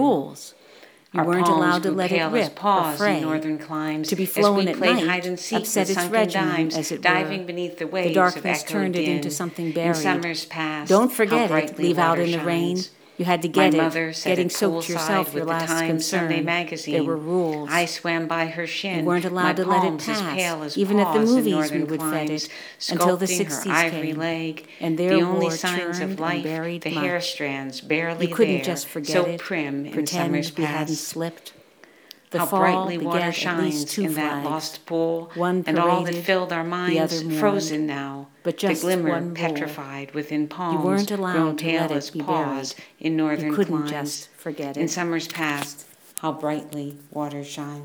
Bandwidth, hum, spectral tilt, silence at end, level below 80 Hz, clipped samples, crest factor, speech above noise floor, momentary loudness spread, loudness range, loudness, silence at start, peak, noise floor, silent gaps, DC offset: 19.5 kHz; none; -4.5 dB/octave; 0 s; -76 dBFS; under 0.1%; 22 dB; 29 dB; 10 LU; 4 LU; -23 LUFS; 0 s; -2 dBFS; -52 dBFS; none; under 0.1%